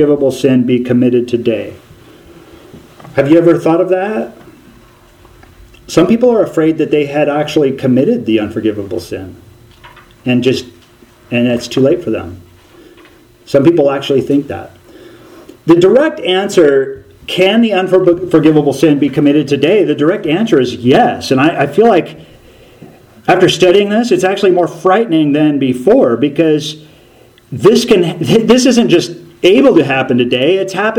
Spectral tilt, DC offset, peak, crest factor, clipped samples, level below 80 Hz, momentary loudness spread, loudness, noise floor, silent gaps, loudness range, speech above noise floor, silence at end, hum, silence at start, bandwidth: -6 dB/octave; under 0.1%; 0 dBFS; 12 dB; 0.3%; -48 dBFS; 11 LU; -11 LUFS; -43 dBFS; none; 5 LU; 33 dB; 0 s; none; 0 s; 16 kHz